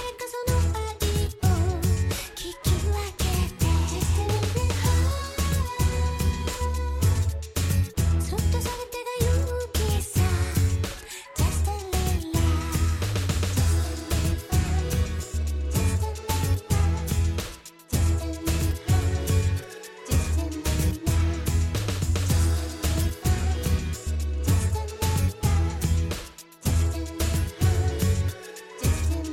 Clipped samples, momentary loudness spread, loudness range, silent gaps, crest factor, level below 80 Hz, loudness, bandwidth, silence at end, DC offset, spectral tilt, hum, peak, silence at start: under 0.1%; 5 LU; 1 LU; none; 12 dB; -30 dBFS; -26 LUFS; 17 kHz; 0 s; under 0.1%; -5 dB/octave; none; -12 dBFS; 0 s